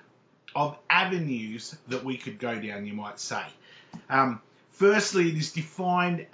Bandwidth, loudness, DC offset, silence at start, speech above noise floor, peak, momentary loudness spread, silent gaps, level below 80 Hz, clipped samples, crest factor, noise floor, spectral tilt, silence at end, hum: 8 kHz; -27 LUFS; under 0.1%; 0.5 s; 28 dB; -6 dBFS; 14 LU; none; -76 dBFS; under 0.1%; 22 dB; -55 dBFS; -4.5 dB/octave; 0.1 s; none